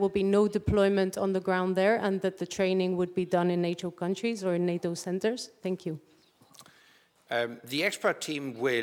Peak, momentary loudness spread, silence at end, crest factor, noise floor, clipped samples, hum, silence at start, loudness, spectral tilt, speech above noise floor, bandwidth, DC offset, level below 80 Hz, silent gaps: -12 dBFS; 9 LU; 0 s; 16 dB; -62 dBFS; under 0.1%; none; 0 s; -29 LUFS; -5.5 dB/octave; 34 dB; 17 kHz; under 0.1%; -56 dBFS; none